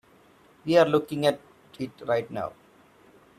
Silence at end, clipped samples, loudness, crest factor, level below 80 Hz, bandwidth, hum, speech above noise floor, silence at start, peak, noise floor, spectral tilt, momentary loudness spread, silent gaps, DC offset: 0.9 s; under 0.1%; -25 LUFS; 22 dB; -68 dBFS; 14 kHz; none; 33 dB; 0.65 s; -6 dBFS; -57 dBFS; -6 dB/octave; 17 LU; none; under 0.1%